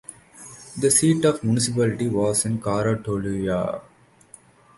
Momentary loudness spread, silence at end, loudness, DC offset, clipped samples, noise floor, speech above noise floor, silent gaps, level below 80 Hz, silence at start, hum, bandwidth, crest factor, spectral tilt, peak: 21 LU; 0.95 s; -22 LUFS; under 0.1%; under 0.1%; -51 dBFS; 29 dB; none; -52 dBFS; 0.1 s; none; 12 kHz; 18 dB; -5 dB/octave; -6 dBFS